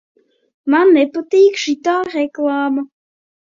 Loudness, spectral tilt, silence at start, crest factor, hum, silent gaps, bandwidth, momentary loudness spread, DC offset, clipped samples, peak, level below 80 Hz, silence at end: -15 LUFS; -3 dB/octave; 0.65 s; 14 dB; none; none; 7.6 kHz; 10 LU; under 0.1%; under 0.1%; -2 dBFS; -66 dBFS; 0.75 s